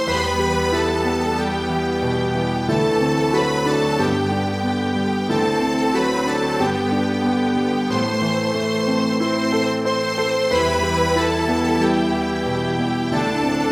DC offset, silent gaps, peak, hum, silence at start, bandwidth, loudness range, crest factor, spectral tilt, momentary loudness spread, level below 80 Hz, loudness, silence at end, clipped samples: under 0.1%; none; -6 dBFS; none; 0 s; 18 kHz; 1 LU; 14 dB; -5.5 dB/octave; 3 LU; -40 dBFS; -20 LUFS; 0 s; under 0.1%